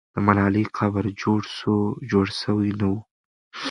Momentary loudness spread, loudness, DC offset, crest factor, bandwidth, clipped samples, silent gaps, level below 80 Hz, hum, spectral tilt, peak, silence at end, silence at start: 6 LU; -23 LUFS; under 0.1%; 22 dB; 10.5 kHz; under 0.1%; 3.11-3.51 s; -48 dBFS; none; -7 dB/octave; 0 dBFS; 0 s; 0.15 s